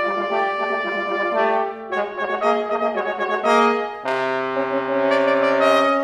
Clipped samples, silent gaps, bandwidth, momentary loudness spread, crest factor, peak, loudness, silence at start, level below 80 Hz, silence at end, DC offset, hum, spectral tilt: under 0.1%; none; 12.5 kHz; 7 LU; 18 dB; -2 dBFS; -20 LUFS; 0 s; -66 dBFS; 0 s; under 0.1%; none; -4.5 dB/octave